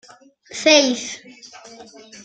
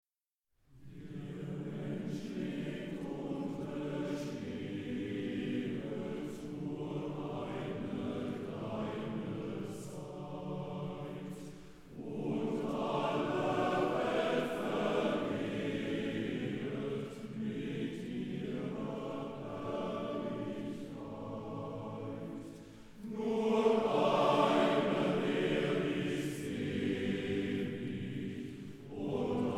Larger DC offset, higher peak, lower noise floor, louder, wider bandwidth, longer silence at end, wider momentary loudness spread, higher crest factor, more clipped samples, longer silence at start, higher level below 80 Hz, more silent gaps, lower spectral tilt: neither; first, -2 dBFS vs -16 dBFS; second, -47 dBFS vs -89 dBFS; first, -16 LUFS vs -37 LUFS; second, 9.2 kHz vs 15 kHz; about the same, 0.05 s vs 0 s; first, 22 LU vs 13 LU; about the same, 20 dB vs 20 dB; neither; second, 0.5 s vs 0.7 s; second, -70 dBFS vs -64 dBFS; neither; second, -0.5 dB/octave vs -6.5 dB/octave